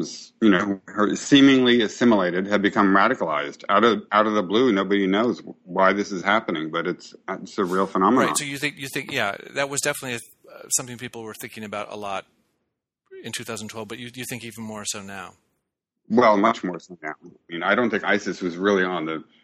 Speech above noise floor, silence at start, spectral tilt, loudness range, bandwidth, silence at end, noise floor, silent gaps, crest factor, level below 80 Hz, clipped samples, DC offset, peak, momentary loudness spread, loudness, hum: 57 dB; 0 s; -4 dB/octave; 15 LU; 15.5 kHz; 0.2 s; -79 dBFS; none; 20 dB; -64 dBFS; under 0.1%; under 0.1%; -4 dBFS; 16 LU; -22 LUFS; none